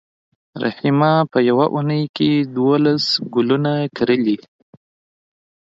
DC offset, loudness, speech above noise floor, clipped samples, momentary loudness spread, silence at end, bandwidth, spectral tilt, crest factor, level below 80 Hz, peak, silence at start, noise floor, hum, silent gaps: under 0.1%; -17 LUFS; over 73 dB; under 0.1%; 6 LU; 1.4 s; 7.8 kHz; -7 dB/octave; 16 dB; -62 dBFS; -2 dBFS; 0.55 s; under -90 dBFS; none; 2.09-2.14 s